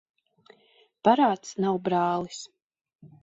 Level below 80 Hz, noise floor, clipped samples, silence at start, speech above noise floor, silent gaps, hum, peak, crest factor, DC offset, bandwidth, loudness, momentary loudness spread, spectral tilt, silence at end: -70 dBFS; -63 dBFS; under 0.1%; 1.05 s; 38 dB; 2.62-2.70 s, 2.95-2.99 s; none; -8 dBFS; 20 dB; under 0.1%; 8.2 kHz; -25 LUFS; 17 LU; -5.5 dB/octave; 0.15 s